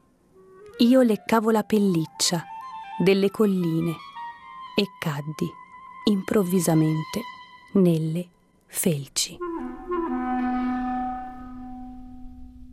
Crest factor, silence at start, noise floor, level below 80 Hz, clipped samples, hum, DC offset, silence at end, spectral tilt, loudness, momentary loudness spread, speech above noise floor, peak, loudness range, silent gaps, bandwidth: 20 dB; 0.6 s; -55 dBFS; -52 dBFS; under 0.1%; none; under 0.1%; 0.05 s; -5.5 dB/octave; -24 LUFS; 19 LU; 33 dB; -4 dBFS; 5 LU; none; 15.5 kHz